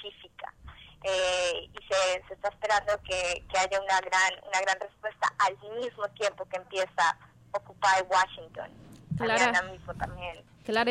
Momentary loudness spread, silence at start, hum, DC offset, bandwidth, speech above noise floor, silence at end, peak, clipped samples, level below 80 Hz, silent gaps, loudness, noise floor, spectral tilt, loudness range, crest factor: 16 LU; 0 s; none; under 0.1%; 11 kHz; 21 dB; 0 s; -10 dBFS; under 0.1%; -56 dBFS; none; -29 LUFS; -50 dBFS; -2.5 dB/octave; 2 LU; 20 dB